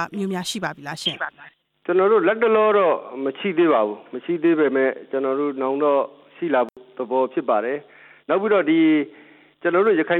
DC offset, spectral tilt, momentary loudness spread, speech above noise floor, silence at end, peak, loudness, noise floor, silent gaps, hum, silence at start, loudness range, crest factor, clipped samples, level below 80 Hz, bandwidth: under 0.1%; -5.5 dB/octave; 12 LU; 29 dB; 0 s; -6 dBFS; -21 LUFS; -49 dBFS; none; none; 0 s; 3 LU; 14 dB; under 0.1%; -74 dBFS; 13.5 kHz